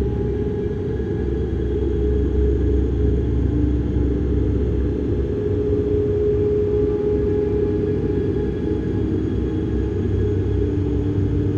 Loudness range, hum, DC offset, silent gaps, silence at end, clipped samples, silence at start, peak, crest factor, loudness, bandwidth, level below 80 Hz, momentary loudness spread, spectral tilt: 1 LU; none; under 0.1%; none; 0 s; under 0.1%; 0 s; -8 dBFS; 12 dB; -21 LUFS; 6.4 kHz; -26 dBFS; 4 LU; -10.5 dB/octave